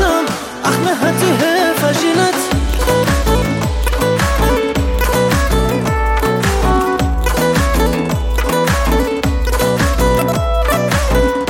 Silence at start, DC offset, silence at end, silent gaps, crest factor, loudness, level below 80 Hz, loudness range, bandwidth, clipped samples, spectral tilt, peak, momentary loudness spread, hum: 0 s; under 0.1%; 0 s; none; 12 dB; -15 LUFS; -20 dBFS; 1 LU; 17 kHz; under 0.1%; -5 dB/octave; 0 dBFS; 3 LU; none